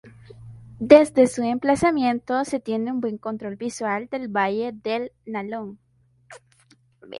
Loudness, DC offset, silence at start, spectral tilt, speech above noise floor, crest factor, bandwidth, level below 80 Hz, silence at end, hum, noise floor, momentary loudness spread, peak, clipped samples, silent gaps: -22 LUFS; under 0.1%; 0.05 s; -5.5 dB/octave; 37 dB; 22 dB; 11.5 kHz; -58 dBFS; 0 s; none; -59 dBFS; 17 LU; 0 dBFS; under 0.1%; none